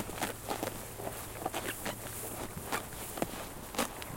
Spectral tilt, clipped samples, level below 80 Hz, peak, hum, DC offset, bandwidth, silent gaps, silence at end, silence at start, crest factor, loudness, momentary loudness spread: -3 dB/octave; under 0.1%; -54 dBFS; -16 dBFS; none; under 0.1%; 17 kHz; none; 0 s; 0 s; 24 dB; -38 LUFS; 5 LU